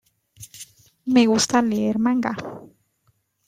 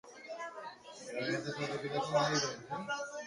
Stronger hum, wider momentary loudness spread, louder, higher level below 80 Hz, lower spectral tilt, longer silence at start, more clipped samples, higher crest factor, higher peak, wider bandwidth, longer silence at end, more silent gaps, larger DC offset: neither; first, 24 LU vs 16 LU; first, -20 LUFS vs -37 LUFS; first, -62 dBFS vs -74 dBFS; about the same, -4 dB/octave vs -3.5 dB/octave; first, 0.4 s vs 0.05 s; neither; about the same, 20 dB vs 18 dB; first, -4 dBFS vs -20 dBFS; first, 15.5 kHz vs 11.5 kHz; first, 0.85 s vs 0 s; neither; neither